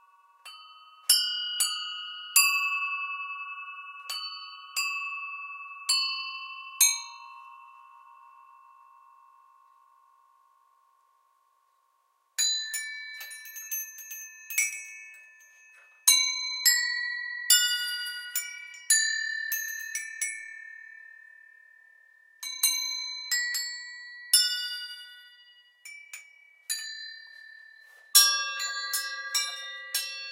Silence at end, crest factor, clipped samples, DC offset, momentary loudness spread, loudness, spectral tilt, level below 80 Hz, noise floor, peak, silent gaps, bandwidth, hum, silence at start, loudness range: 0 s; 30 dB; under 0.1%; under 0.1%; 23 LU; -26 LUFS; 11 dB/octave; under -90 dBFS; -71 dBFS; -2 dBFS; none; 16 kHz; none; 0.45 s; 9 LU